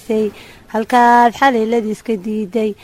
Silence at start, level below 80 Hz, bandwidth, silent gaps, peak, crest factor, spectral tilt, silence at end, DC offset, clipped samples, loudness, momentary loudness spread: 0.1 s; -52 dBFS; 15.5 kHz; none; 0 dBFS; 14 dB; -5 dB/octave; 0.1 s; under 0.1%; under 0.1%; -15 LUFS; 12 LU